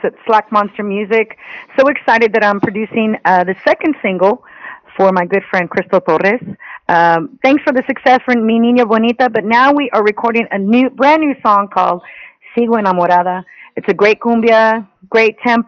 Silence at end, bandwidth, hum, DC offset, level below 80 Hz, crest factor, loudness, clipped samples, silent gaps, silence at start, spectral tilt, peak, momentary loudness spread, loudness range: 0.05 s; 6.8 kHz; none; under 0.1%; -58 dBFS; 12 dB; -13 LUFS; under 0.1%; none; 0.05 s; -6.5 dB/octave; 0 dBFS; 9 LU; 3 LU